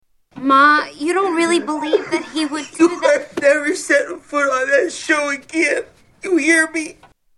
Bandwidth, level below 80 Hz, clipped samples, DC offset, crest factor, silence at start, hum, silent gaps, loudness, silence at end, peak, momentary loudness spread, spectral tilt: 12 kHz; -62 dBFS; under 0.1%; under 0.1%; 16 dB; 0.35 s; none; none; -17 LUFS; 0.45 s; 0 dBFS; 9 LU; -2 dB/octave